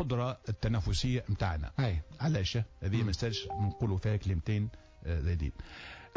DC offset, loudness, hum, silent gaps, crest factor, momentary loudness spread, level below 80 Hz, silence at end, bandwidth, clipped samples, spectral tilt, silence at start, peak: under 0.1%; -34 LUFS; none; none; 12 dB; 7 LU; -40 dBFS; 0.1 s; 8 kHz; under 0.1%; -6.5 dB/octave; 0 s; -20 dBFS